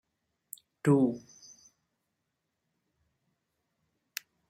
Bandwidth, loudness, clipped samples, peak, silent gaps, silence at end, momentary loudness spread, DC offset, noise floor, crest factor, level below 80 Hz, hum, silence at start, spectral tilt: 16 kHz; -28 LUFS; under 0.1%; -10 dBFS; none; 3.3 s; 23 LU; under 0.1%; -83 dBFS; 24 dB; -76 dBFS; none; 0.85 s; -7 dB/octave